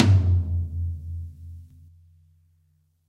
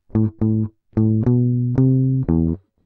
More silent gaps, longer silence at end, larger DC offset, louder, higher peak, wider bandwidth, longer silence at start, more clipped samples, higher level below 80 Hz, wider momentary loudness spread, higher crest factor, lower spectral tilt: neither; first, 1.45 s vs 0.3 s; neither; second, -25 LUFS vs -19 LUFS; about the same, -4 dBFS vs -4 dBFS; first, 6.8 kHz vs 2.3 kHz; second, 0 s vs 0.15 s; neither; about the same, -38 dBFS vs -38 dBFS; first, 24 LU vs 6 LU; first, 22 dB vs 14 dB; second, -7.5 dB/octave vs -13.5 dB/octave